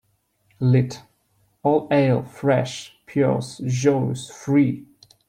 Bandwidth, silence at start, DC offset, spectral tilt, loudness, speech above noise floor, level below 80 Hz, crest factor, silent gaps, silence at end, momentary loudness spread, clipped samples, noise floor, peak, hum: 10.5 kHz; 0.6 s; under 0.1%; -7 dB/octave; -22 LUFS; 45 dB; -60 dBFS; 16 dB; none; 0.45 s; 11 LU; under 0.1%; -66 dBFS; -6 dBFS; none